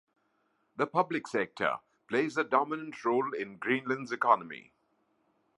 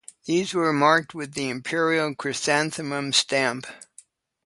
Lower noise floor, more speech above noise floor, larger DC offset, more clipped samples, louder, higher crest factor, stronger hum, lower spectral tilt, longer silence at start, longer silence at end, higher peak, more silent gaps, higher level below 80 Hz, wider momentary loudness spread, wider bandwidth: first, -75 dBFS vs -54 dBFS; first, 44 dB vs 31 dB; neither; neither; second, -31 LUFS vs -23 LUFS; about the same, 24 dB vs 22 dB; neither; first, -5.5 dB/octave vs -3.5 dB/octave; first, 0.8 s vs 0.25 s; first, 0.95 s vs 0.7 s; second, -10 dBFS vs -4 dBFS; neither; second, -80 dBFS vs -70 dBFS; about the same, 8 LU vs 9 LU; about the same, 11.5 kHz vs 11.5 kHz